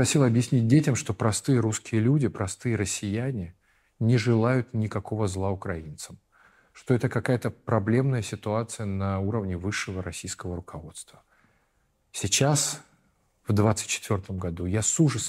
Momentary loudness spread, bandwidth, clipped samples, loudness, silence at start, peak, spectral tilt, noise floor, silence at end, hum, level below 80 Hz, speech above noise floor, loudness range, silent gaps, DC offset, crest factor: 14 LU; 15.5 kHz; under 0.1%; -26 LUFS; 0 s; -8 dBFS; -5 dB/octave; -70 dBFS; 0 s; none; -56 dBFS; 44 dB; 6 LU; none; under 0.1%; 18 dB